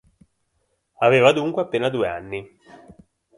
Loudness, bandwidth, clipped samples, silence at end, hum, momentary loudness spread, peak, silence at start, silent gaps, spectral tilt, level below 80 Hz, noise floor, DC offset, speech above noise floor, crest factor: -20 LUFS; 11.5 kHz; under 0.1%; 0.9 s; none; 17 LU; -2 dBFS; 1 s; none; -5.5 dB/octave; -58 dBFS; -71 dBFS; under 0.1%; 51 dB; 22 dB